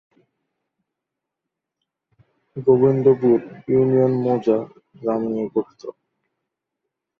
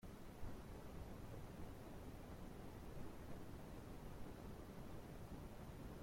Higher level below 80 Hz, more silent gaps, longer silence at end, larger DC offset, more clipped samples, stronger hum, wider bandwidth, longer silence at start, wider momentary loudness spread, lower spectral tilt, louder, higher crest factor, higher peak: about the same, -62 dBFS vs -60 dBFS; neither; first, 1.3 s vs 0 s; neither; neither; neither; second, 6 kHz vs 16.5 kHz; first, 2.55 s vs 0 s; first, 20 LU vs 1 LU; first, -10.5 dB/octave vs -6.5 dB/octave; first, -19 LUFS vs -56 LUFS; about the same, 18 dB vs 16 dB; first, -4 dBFS vs -38 dBFS